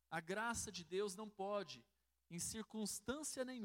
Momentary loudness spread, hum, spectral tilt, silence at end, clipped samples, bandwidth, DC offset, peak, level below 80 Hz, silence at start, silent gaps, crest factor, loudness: 5 LU; none; -3 dB/octave; 0 s; under 0.1%; 16 kHz; under 0.1%; -30 dBFS; -72 dBFS; 0.1 s; none; 16 dB; -46 LUFS